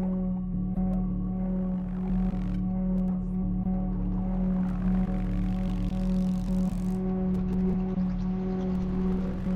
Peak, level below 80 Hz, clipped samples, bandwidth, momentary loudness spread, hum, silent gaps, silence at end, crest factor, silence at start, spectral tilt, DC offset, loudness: -18 dBFS; -34 dBFS; under 0.1%; 4.2 kHz; 3 LU; none; none; 0 s; 10 dB; 0 s; -10 dB/octave; under 0.1%; -29 LUFS